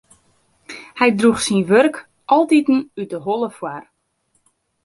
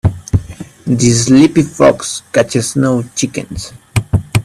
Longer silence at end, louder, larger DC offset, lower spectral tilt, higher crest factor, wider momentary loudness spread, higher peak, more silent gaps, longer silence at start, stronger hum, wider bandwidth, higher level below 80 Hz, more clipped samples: first, 1.05 s vs 0 s; second, -17 LUFS vs -13 LUFS; neither; about the same, -5 dB/octave vs -5.5 dB/octave; about the same, 16 dB vs 12 dB; first, 20 LU vs 14 LU; about the same, -2 dBFS vs 0 dBFS; neither; first, 0.7 s vs 0.05 s; neither; second, 11.5 kHz vs 14.5 kHz; second, -60 dBFS vs -32 dBFS; neither